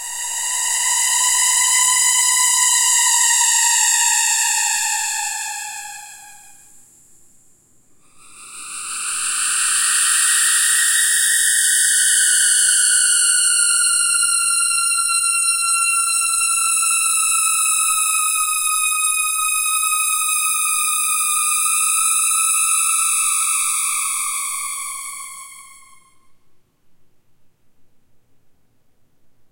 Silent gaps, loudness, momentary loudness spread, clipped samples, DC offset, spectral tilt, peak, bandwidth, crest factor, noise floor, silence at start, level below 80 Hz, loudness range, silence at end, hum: none; -14 LUFS; 10 LU; under 0.1%; under 0.1%; 6 dB/octave; -2 dBFS; 16.5 kHz; 16 dB; -54 dBFS; 0 s; -70 dBFS; 13 LU; 1.65 s; none